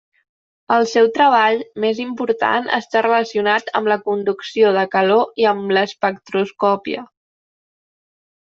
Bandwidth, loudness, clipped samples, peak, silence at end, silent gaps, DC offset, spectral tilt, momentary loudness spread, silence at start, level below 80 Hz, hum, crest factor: 7.4 kHz; -17 LUFS; under 0.1%; -2 dBFS; 1.45 s; none; under 0.1%; -5 dB/octave; 8 LU; 0.7 s; -66 dBFS; none; 16 dB